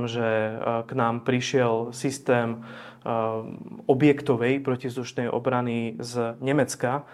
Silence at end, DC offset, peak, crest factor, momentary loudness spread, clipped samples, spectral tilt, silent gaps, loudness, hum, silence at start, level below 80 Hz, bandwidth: 0 s; under 0.1%; -6 dBFS; 20 dB; 9 LU; under 0.1%; -6 dB/octave; none; -26 LUFS; none; 0 s; -68 dBFS; 14 kHz